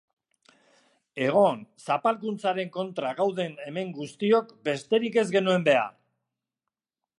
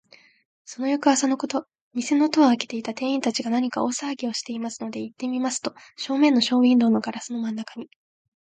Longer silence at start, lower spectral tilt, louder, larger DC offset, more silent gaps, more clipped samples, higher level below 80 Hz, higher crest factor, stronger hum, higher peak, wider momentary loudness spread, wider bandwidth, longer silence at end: first, 1.15 s vs 0.7 s; first, -5.5 dB/octave vs -3.5 dB/octave; second, -26 LUFS vs -23 LUFS; neither; second, none vs 1.81-1.91 s; neither; about the same, -78 dBFS vs -74 dBFS; about the same, 18 dB vs 18 dB; neither; second, -10 dBFS vs -6 dBFS; about the same, 12 LU vs 14 LU; first, 11.5 kHz vs 9.4 kHz; first, 1.3 s vs 0.7 s